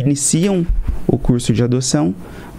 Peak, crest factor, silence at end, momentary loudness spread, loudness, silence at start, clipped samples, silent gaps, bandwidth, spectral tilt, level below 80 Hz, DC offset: 0 dBFS; 16 dB; 0 s; 7 LU; -16 LUFS; 0 s; under 0.1%; none; 15.5 kHz; -5.5 dB/octave; -24 dBFS; under 0.1%